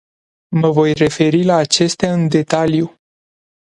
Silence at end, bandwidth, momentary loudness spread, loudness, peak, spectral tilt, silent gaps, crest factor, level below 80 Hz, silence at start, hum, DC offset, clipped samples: 0.75 s; 11.5 kHz; 5 LU; -15 LUFS; 0 dBFS; -5.5 dB/octave; none; 16 dB; -50 dBFS; 0.5 s; none; under 0.1%; under 0.1%